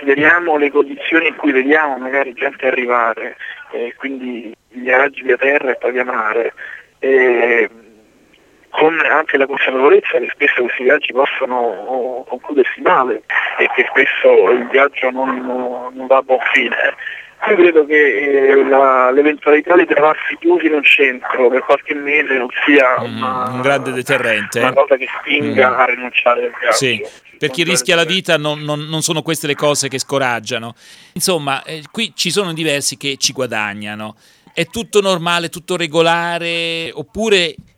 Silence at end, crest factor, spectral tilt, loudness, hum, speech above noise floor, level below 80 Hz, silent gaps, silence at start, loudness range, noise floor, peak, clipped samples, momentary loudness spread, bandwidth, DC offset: 0.25 s; 14 dB; -3.5 dB/octave; -14 LUFS; none; 35 dB; -60 dBFS; none; 0 s; 6 LU; -50 dBFS; 0 dBFS; under 0.1%; 12 LU; 16.5 kHz; under 0.1%